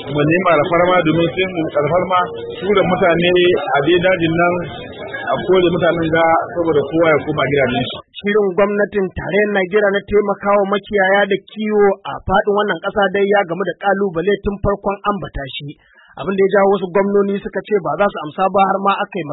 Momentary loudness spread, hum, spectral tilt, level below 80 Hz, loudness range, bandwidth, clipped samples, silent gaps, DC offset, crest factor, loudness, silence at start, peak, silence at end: 8 LU; none; -11.5 dB/octave; -40 dBFS; 3 LU; 4.1 kHz; under 0.1%; none; under 0.1%; 14 dB; -16 LUFS; 0 s; -2 dBFS; 0 s